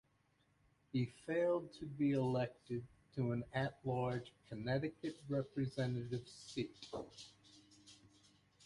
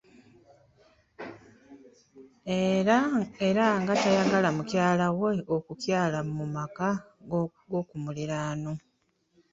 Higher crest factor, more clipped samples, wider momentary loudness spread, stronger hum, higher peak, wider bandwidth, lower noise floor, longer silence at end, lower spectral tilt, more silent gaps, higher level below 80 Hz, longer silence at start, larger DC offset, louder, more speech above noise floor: about the same, 18 dB vs 20 dB; neither; about the same, 15 LU vs 13 LU; neither; second, -24 dBFS vs -10 dBFS; first, 11.5 kHz vs 7.8 kHz; first, -77 dBFS vs -72 dBFS; about the same, 0.7 s vs 0.75 s; about the same, -7 dB/octave vs -6 dB/octave; neither; second, -70 dBFS vs -64 dBFS; second, 0.95 s vs 1.2 s; neither; second, -42 LUFS vs -28 LUFS; second, 36 dB vs 45 dB